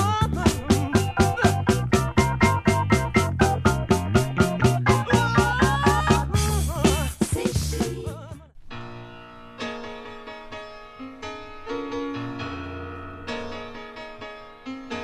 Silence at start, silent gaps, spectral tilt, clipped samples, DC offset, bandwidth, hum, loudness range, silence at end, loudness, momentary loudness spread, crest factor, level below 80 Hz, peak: 0 s; none; -5.5 dB/octave; under 0.1%; under 0.1%; 15.5 kHz; none; 14 LU; 0 s; -23 LUFS; 19 LU; 18 dB; -34 dBFS; -4 dBFS